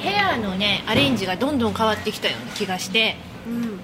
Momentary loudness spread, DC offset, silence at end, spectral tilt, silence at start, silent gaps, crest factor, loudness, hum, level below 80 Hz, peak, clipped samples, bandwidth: 9 LU; under 0.1%; 0 s; -4 dB/octave; 0 s; none; 18 dB; -21 LUFS; none; -48 dBFS; -4 dBFS; under 0.1%; 16 kHz